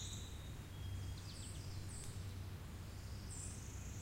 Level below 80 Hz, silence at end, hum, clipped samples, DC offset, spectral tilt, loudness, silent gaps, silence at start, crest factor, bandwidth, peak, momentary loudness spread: -54 dBFS; 0 s; none; under 0.1%; under 0.1%; -4 dB/octave; -50 LUFS; none; 0 s; 12 dB; 16 kHz; -36 dBFS; 3 LU